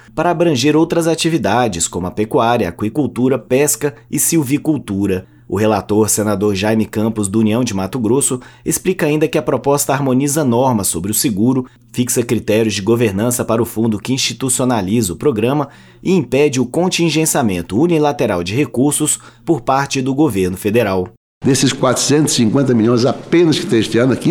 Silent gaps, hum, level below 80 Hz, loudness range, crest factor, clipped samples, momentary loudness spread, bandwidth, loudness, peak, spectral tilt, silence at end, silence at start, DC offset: 21.17-21.41 s; none; -48 dBFS; 2 LU; 14 dB; under 0.1%; 5 LU; 19 kHz; -15 LUFS; -2 dBFS; -4.5 dB/octave; 0 s; 0.15 s; under 0.1%